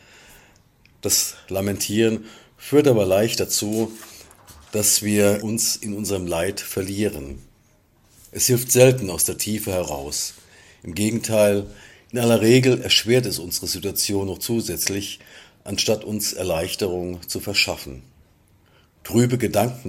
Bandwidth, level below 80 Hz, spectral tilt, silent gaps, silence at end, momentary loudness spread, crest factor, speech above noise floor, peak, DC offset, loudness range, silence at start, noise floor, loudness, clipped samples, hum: 16.5 kHz; -50 dBFS; -4 dB/octave; none; 0 s; 14 LU; 22 dB; 37 dB; 0 dBFS; under 0.1%; 5 LU; 1.05 s; -58 dBFS; -21 LUFS; under 0.1%; none